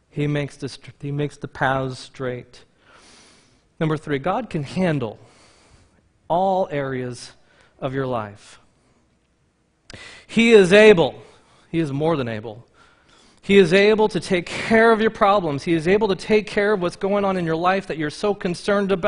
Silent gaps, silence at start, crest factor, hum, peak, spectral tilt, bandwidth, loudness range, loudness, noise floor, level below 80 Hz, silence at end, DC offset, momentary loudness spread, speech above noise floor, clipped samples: none; 0.15 s; 20 dB; none; 0 dBFS; -6 dB/octave; 10.5 kHz; 10 LU; -19 LUFS; -64 dBFS; -52 dBFS; 0 s; under 0.1%; 18 LU; 45 dB; under 0.1%